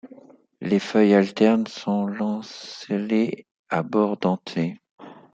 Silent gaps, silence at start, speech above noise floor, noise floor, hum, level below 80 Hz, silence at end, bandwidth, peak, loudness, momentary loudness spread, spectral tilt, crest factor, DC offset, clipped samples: 3.51-3.65 s, 4.91-4.98 s; 0.05 s; 27 dB; -49 dBFS; none; -70 dBFS; 0.2 s; 7.8 kHz; -4 dBFS; -23 LUFS; 16 LU; -7 dB/octave; 20 dB; under 0.1%; under 0.1%